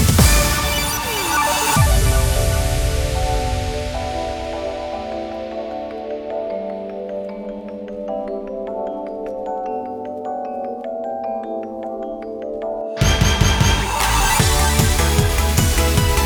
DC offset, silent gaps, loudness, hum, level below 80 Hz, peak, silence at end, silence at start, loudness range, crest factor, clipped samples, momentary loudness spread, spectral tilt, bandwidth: under 0.1%; none; -20 LUFS; none; -24 dBFS; 0 dBFS; 0 s; 0 s; 11 LU; 18 dB; under 0.1%; 13 LU; -4 dB/octave; over 20 kHz